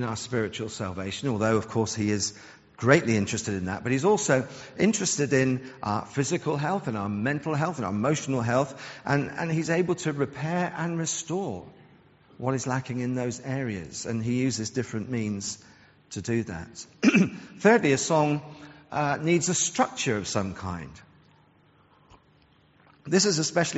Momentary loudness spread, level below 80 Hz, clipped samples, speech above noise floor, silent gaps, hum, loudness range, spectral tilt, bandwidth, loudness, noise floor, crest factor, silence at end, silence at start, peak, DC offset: 12 LU; -60 dBFS; under 0.1%; 34 dB; none; none; 6 LU; -5 dB/octave; 8 kHz; -27 LUFS; -60 dBFS; 24 dB; 0 s; 0 s; -2 dBFS; under 0.1%